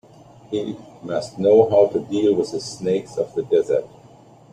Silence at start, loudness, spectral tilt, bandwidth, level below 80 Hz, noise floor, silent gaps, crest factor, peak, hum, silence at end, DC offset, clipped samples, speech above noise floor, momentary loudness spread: 0.5 s; -20 LUFS; -6 dB/octave; 10 kHz; -60 dBFS; -47 dBFS; none; 18 dB; -2 dBFS; none; 0.65 s; under 0.1%; under 0.1%; 28 dB; 13 LU